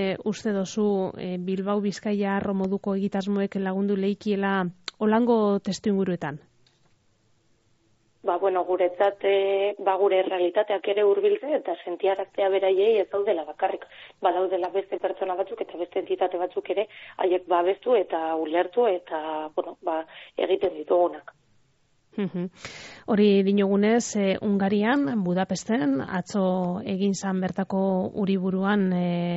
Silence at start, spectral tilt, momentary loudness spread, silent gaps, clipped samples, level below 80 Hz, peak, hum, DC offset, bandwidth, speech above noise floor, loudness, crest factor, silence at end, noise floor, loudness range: 0 s; -5.5 dB/octave; 9 LU; none; under 0.1%; -66 dBFS; -10 dBFS; none; under 0.1%; 8 kHz; 41 dB; -25 LUFS; 16 dB; 0 s; -65 dBFS; 5 LU